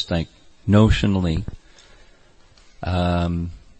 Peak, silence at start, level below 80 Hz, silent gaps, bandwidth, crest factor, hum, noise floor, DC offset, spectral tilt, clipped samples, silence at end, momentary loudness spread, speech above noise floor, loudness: -2 dBFS; 0 s; -34 dBFS; none; 8.6 kHz; 20 dB; none; -51 dBFS; under 0.1%; -7.5 dB/octave; under 0.1%; 0.2 s; 16 LU; 32 dB; -21 LUFS